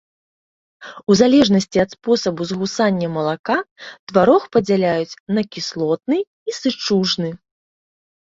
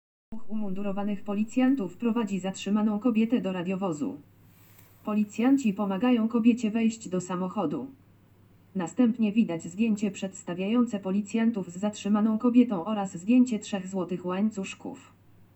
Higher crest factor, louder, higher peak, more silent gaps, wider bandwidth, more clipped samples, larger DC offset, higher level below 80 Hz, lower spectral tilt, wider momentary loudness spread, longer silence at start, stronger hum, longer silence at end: about the same, 18 dB vs 18 dB; first, -18 LUFS vs -28 LUFS; first, -2 dBFS vs -10 dBFS; first, 3.39-3.44 s, 3.71-3.76 s, 3.99-4.07 s, 5.20-5.26 s, 6.27-6.46 s vs none; about the same, 7.8 kHz vs 8.2 kHz; neither; neither; first, -56 dBFS vs -70 dBFS; about the same, -5.5 dB/octave vs -6.5 dB/octave; about the same, 10 LU vs 12 LU; first, 0.8 s vs 0.3 s; neither; first, 1 s vs 0.2 s